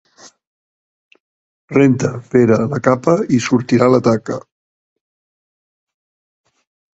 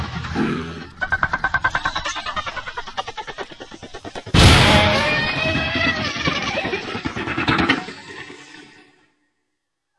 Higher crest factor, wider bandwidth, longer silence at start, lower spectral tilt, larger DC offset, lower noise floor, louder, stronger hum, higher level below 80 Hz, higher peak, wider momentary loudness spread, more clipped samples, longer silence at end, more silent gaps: about the same, 18 dB vs 22 dB; second, 8 kHz vs 12 kHz; first, 1.7 s vs 0 s; first, -7 dB/octave vs -4.5 dB/octave; neither; first, under -90 dBFS vs -77 dBFS; first, -14 LUFS vs -19 LUFS; neither; second, -54 dBFS vs -34 dBFS; about the same, 0 dBFS vs 0 dBFS; second, 7 LU vs 21 LU; neither; first, 2.55 s vs 1.35 s; neither